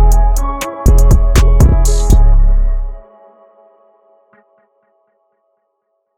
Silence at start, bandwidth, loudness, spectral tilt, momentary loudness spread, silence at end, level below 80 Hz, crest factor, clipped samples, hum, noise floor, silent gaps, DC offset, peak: 0 s; 14.5 kHz; -13 LUFS; -6 dB/octave; 10 LU; 3.15 s; -12 dBFS; 10 dB; under 0.1%; none; -67 dBFS; none; under 0.1%; 0 dBFS